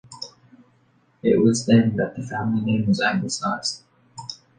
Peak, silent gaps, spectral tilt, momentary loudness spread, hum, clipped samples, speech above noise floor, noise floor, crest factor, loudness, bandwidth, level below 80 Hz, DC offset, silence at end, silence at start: -4 dBFS; none; -5.5 dB/octave; 19 LU; none; under 0.1%; 40 dB; -61 dBFS; 18 dB; -21 LUFS; 9.6 kHz; -56 dBFS; under 0.1%; 0.25 s; 0.1 s